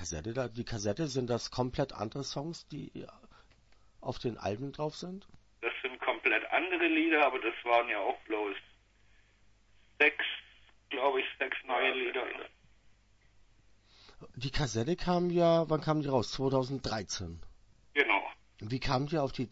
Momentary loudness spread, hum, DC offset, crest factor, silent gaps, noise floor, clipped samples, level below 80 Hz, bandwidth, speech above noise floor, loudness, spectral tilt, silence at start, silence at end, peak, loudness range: 16 LU; none; under 0.1%; 22 dB; none; -65 dBFS; under 0.1%; -54 dBFS; 8 kHz; 32 dB; -32 LUFS; -5 dB/octave; 0 s; 0.05 s; -12 dBFS; 9 LU